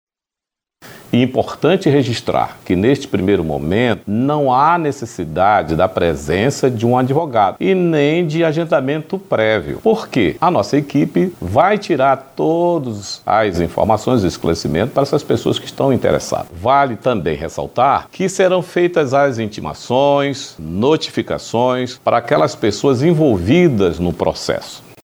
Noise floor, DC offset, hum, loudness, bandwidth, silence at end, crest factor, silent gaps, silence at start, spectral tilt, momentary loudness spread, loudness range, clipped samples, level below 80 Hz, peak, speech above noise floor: -87 dBFS; under 0.1%; none; -16 LUFS; over 20 kHz; 0.25 s; 16 dB; none; 0.85 s; -6 dB/octave; 7 LU; 2 LU; under 0.1%; -42 dBFS; 0 dBFS; 72 dB